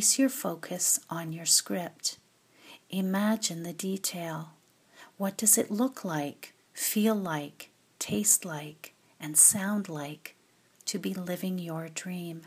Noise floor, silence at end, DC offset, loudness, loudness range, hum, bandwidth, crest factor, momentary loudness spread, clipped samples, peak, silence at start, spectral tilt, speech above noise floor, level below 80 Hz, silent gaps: -63 dBFS; 0 s; under 0.1%; -28 LUFS; 5 LU; none; 15.5 kHz; 24 dB; 17 LU; under 0.1%; -8 dBFS; 0 s; -3 dB/octave; 33 dB; -76 dBFS; none